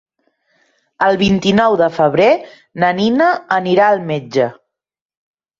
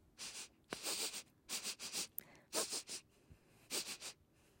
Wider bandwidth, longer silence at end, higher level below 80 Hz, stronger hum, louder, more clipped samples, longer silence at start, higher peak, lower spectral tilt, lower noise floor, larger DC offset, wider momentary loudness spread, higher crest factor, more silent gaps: second, 7.6 kHz vs 16.5 kHz; first, 1.05 s vs 0.35 s; first, -50 dBFS vs -78 dBFS; neither; first, -14 LUFS vs -44 LUFS; neither; first, 1 s vs 0.15 s; first, -2 dBFS vs -22 dBFS; first, -6 dB/octave vs 0 dB/octave; second, -63 dBFS vs -67 dBFS; neither; second, 6 LU vs 10 LU; second, 14 dB vs 26 dB; neither